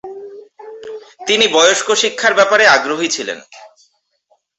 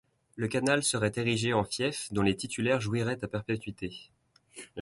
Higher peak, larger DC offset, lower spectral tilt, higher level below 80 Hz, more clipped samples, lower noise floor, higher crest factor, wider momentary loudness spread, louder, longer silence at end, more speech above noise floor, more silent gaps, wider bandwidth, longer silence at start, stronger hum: first, 0 dBFS vs -12 dBFS; neither; second, -0.5 dB/octave vs -4.5 dB/octave; about the same, -62 dBFS vs -58 dBFS; neither; first, -61 dBFS vs -52 dBFS; about the same, 16 dB vs 20 dB; first, 22 LU vs 14 LU; first, -12 LUFS vs -30 LUFS; first, 0.9 s vs 0 s; first, 47 dB vs 22 dB; neither; second, 8.2 kHz vs 11.5 kHz; second, 0.05 s vs 0.35 s; neither